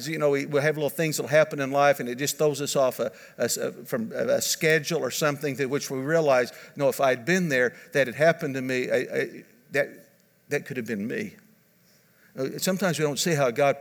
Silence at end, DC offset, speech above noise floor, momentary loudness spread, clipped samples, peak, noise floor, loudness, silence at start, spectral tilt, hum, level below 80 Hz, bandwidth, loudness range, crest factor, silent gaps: 0 s; under 0.1%; 36 dB; 10 LU; under 0.1%; -8 dBFS; -61 dBFS; -25 LUFS; 0 s; -4 dB/octave; none; -78 dBFS; over 20 kHz; 7 LU; 18 dB; none